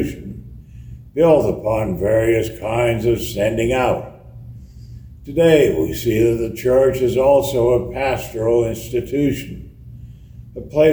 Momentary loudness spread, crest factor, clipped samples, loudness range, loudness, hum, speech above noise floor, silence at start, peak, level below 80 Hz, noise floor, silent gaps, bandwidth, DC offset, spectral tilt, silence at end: 22 LU; 18 dB; under 0.1%; 4 LU; -17 LUFS; none; 22 dB; 0 s; -2 dBFS; -38 dBFS; -38 dBFS; none; over 20 kHz; under 0.1%; -6.5 dB/octave; 0 s